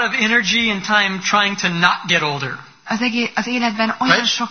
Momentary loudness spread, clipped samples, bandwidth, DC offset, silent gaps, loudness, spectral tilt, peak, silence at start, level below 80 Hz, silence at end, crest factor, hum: 7 LU; under 0.1%; 6.6 kHz; 0.2%; none; -16 LUFS; -3 dB/octave; 0 dBFS; 0 s; -56 dBFS; 0 s; 18 dB; none